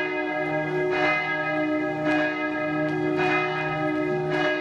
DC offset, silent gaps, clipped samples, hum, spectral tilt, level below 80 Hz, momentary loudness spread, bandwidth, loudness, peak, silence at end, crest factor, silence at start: under 0.1%; none; under 0.1%; none; -6.5 dB/octave; -60 dBFS; 4 LU; 8 kHz; -25 LUFS; -10 dBFS; 0 s; 14 dB; 0 s